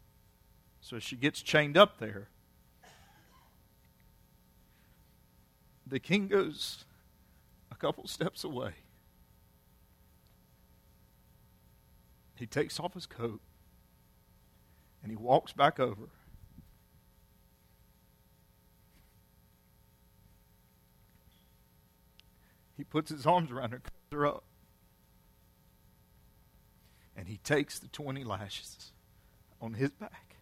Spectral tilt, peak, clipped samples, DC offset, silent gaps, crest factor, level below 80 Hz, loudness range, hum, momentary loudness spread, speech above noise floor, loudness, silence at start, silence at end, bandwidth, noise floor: -5 dB/octave; -6 dBFS; under 0.1%; under 0.1%; none; 32 dB; -66 dBFS; 13 LU; none; 21 LU; 33 dB; -33 LUFS; 0.85 s; 0.25 s; 16 kHz; -65 dBFS